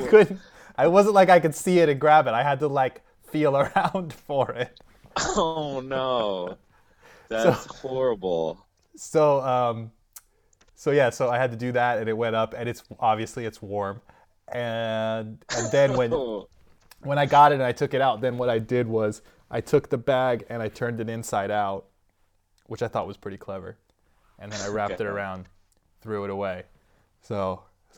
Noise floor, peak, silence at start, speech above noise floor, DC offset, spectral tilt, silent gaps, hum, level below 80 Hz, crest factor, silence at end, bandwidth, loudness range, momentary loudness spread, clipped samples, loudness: -66 dBFS; -2 dBFS; 0 s; 43 dB; under 0.1%; -5.5 dB/octave; none; none; -56 dBFS; 22 dB; 0.4 s; 18.5 kHz; 11 LU; 17 LU; under 0.1%; -24 LUFS